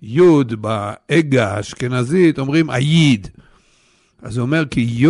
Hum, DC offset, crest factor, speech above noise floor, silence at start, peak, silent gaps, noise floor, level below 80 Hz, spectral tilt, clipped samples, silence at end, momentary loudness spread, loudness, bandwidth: none; under 0.1%; 12 dB; 41 dB; 0 s; -4 dBFS; none; -56 dBFS; -48 dBFS; -6.5 dB/octave; under 0.1%; 0 s; 10 LU; -16 LUFS; 11.5 kHz